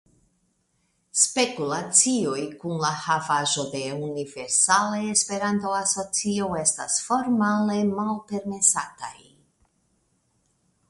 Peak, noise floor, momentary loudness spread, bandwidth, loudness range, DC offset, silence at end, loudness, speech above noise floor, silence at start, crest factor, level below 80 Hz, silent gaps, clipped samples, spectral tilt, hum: -2 dBFS; -70 dBFS; 12 LU; 11.5 kHz; 3 LU; under 0.1%; 1.75 s; -23 LUFS; 46 dB; 1.15 s; 24 dB; -64 dBFS; none; under 0.1%; -2.5 dB/octave; none